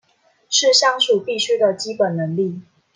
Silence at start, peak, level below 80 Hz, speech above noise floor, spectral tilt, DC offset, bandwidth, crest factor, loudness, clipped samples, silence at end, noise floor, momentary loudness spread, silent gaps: 0.5 s; -2 dBFS; -74 dBFS; 36 dB; -2.5 dB/octave; under 0.1%; 10 kHz; 18 dB; -17 LUFS; under 0.1%; 0.35 s; -54 dBFS; 9 LU; none